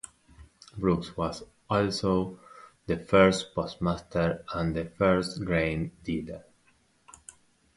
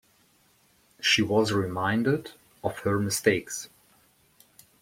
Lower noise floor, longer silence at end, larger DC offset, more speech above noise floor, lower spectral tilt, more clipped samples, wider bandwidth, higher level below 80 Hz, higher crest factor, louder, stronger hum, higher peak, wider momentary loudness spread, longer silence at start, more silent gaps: about the same, -66 dBFS vs -64 dBFS; first, 1.35 s vs 1.15 s; neither; about the same, 39 dB vs 38 dB; first, -6 dB/octave vs -4 dB/octave; neither; second, 11.5 kHz vs 16.5 kHz; first, -48 dBFS vs -62 dBFS; about the same, 22 dB vs 22 dB; about the same, -28 LUFS vs -26 LUFS; neither; about the same, -8 dBFS vs -8 dBFS; first, 23 LU vs 14 LU; second, 0.05 s vs 1 s; neither